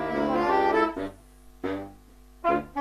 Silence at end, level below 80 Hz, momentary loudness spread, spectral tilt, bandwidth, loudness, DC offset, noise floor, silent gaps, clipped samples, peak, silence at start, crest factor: 0 s; -52 dBFS; 14 LU; -6.5 dB/octave; 14 kHz; -27 LUFS; under 0.1%; -52 dBFS; none; under 0.1%; -10 dBFS; 0 s; 16 dB